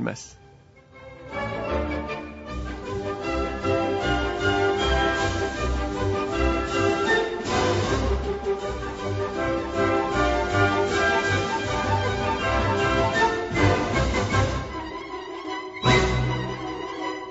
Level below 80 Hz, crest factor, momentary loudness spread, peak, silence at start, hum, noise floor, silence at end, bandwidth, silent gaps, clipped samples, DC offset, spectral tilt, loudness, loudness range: -34 dBFS; 18 dB; 11 LU; -6 dBFS; 0 s; none; -51 dBFS; 0 s; 8 kHz; none; under 0.1%; under 0.1%; -5.5 dB/octave; -24 LUFS; 5 LU